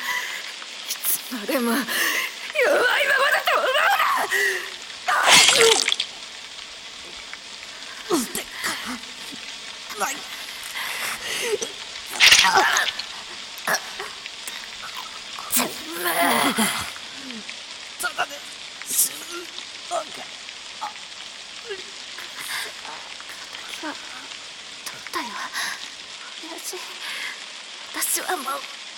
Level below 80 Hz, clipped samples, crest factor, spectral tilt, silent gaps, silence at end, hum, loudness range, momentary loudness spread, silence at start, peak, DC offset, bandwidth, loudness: -62 dBFS; under 0.1%; 20 dB; 0 dB/octave; none; 0 s; none; 14 LU; 17 LU; 0 s; -4 dBFS; under 0.1%; 17 kHz; -22 LUFS